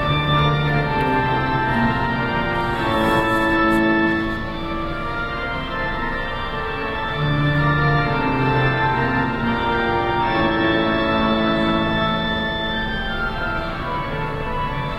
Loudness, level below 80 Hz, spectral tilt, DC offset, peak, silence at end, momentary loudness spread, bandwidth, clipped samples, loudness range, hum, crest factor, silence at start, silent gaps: -20 LUFS; -32 dBFS; -7 dB/octave; under 0.1%; -6 dBFS; 0 s; 7 LU; 14 kHz; under 0.1%; 3 LU; none; 14 dB; 0 s; none